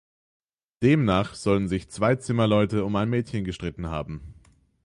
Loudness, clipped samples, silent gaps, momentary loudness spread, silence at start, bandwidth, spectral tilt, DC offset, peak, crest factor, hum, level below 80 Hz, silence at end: -25 LUFS; under 0.1%; none; 11 LU; 0.8 s; 11.5 kHz; -7 dB/octave; under 0.1%; -8 dBFS; 18 dB; none; -46 dBFS; 0.5 s